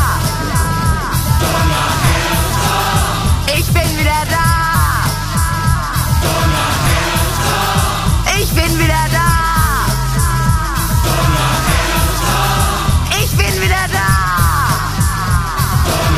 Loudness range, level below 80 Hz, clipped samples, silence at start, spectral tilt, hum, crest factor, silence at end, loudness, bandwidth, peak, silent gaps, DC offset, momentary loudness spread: 1 LU; -20 dBFS; under 0.1%; 0 s; -4 dB/octave; none; 14 dB; 0 s; -14 LUFS; 15.5 kHz; 0 dBFS; none; under 0.1%; 3 LU